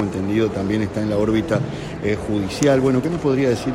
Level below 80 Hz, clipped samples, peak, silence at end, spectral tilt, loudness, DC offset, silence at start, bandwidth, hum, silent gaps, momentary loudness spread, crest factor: -42 dBFS; under 0.1%; -2 dBFS; 0 s; -6.5 dB/octave; -20 LUFS; under 0.1%; 0 s; 15.5 kHz; none; none; 6 LU; 18 dB